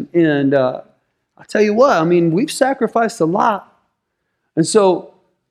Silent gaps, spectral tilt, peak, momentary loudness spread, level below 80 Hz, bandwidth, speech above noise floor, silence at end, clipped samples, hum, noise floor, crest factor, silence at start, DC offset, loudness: none; -5.5 dB/octave; -2 dBFS; 10 LU; -62 dBFS; 14 kHz; 58 dB; 0.5 s; under 0.1%; none; -72 dBFS; 14 dB; 0 s; under 0.1%; -15 LUFS